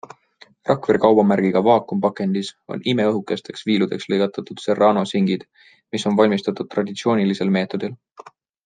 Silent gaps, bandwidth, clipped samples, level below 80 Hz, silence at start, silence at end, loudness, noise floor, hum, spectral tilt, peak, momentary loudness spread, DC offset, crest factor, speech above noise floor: none; 9.4 kHz; under 0.1%; -66 dBFS; 0.65 s; 0.7 s; -20 LUFS; -52 dBFS; none; -6.5 dB/octave; -2 dBFS; 11 LU; under 0.1%; 18 dB; 33 dB